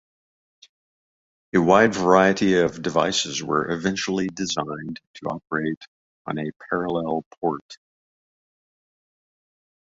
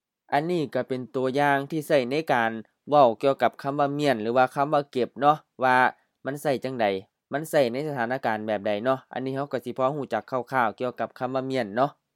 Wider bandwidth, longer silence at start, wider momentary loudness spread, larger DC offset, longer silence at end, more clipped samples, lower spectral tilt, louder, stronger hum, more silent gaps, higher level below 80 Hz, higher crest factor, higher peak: second, 8 kHz vs 17 kHz; first, 1.55 s vs 0.3 s; first, 15 LU vs 9 LU; neither; first, 2.25 s vs 0.25 s; neither; second, -4.5 dB/octave vs -6 dB/octave; first, -22 LUFS vs -25 LUFS; neither; first, 5.07-5.14 s, 5.77-5.81 s, 5.88-6.25 s, 6.56-6.60 s, 7.26-7.31 s, 7.61-7.69 s vs none; first, -58 dBFS vs -78 dBFS; about the same, 22 dB vs 20 dB; first, -2 dBFS vs -6 dBFS